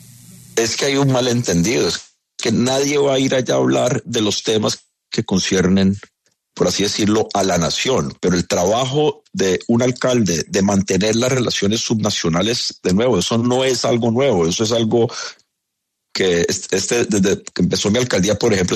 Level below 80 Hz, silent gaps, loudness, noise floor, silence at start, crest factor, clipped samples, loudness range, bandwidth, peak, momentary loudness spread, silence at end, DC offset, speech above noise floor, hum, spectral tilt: -48 dBFS; none; -17 LUFS; -77 dBFS; 0.3 s; 14 dB; under 0.1%; 2 LU; 13.5 kHz; -4 dBFS; 4 LU; 0 s; under 0.1%; 60 dB; none; -4.5 dB/octave